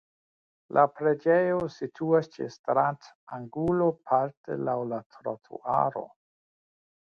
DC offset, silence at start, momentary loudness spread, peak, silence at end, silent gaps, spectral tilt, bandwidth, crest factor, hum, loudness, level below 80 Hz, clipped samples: under 0.1%; 0.7 s; 14 LU; -8 dBFS; 1.05 s; 2.59-2.64 s, 3.15-3.27 s, 4.37-4.44 s, 5.06-5.10 s; -8.5 dB/octave; 7 kHz; 20 dB; none; -28 LUFS; -64 dBFS; under 0.1%